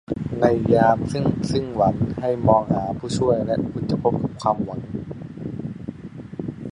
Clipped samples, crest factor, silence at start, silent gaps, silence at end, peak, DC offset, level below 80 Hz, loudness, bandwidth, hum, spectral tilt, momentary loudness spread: under 0.1%; 20 dB; 0.1 s; none; 0 s; -2 dBFS; under 0.1%; -44 dBFS; -22 LUFS; 11 kHz; none; -7.5 dB/octave; 15 LU